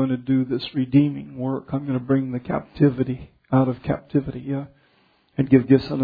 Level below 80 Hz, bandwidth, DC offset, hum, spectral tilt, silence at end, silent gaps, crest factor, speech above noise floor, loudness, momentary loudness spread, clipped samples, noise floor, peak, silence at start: -50 dBFS; 5 kHz; under 0.1%; none; -10.5 dB/octave; 0 s; none; 20 dB; 40 dB; -22 LUFS; 11 LU; under 0.1%; -61 dBFS; -2 dBFS; 0 s